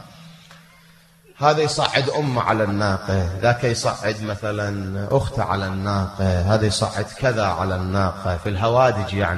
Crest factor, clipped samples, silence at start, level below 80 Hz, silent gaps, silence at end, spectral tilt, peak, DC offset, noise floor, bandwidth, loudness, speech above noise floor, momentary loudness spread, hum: 22 dB; under 0.1%; 0 s; -42 dBFS; none; 0 s; -5.5 dB/octave; 0 dBFS; under 0.1%; -51 dBFS; 12.5 kHz; -21 LUFS; 31 dB; 7 LU; none